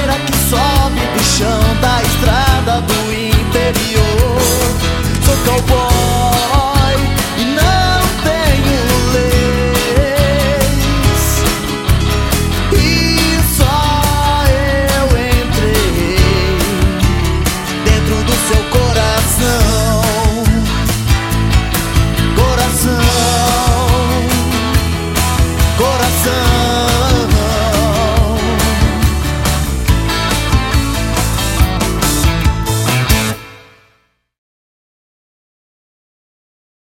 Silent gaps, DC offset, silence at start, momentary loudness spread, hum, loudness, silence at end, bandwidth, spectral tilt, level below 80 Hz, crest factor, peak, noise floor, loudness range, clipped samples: none; under 0.1%; 0 s; 3 LU; none; -13 LUFS; 3.25 s; 17 kHz; -4.5 dB/octave; -18 dBFS; 12 dB; 0 dBFS; -57 dBFS; 2 LU; under 0.1%